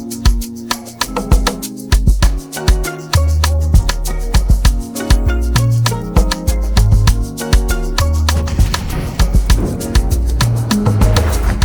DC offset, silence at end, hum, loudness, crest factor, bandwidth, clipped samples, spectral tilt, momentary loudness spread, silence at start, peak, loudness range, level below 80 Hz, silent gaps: under 0.1%; 0 s; none; -15 LUFS; 12 dB; over 20 kHz; under 0.1%; -5 dB/octave; 6 LU; 0 s; 0 dBFS; 1 LU; -14 dBFS; none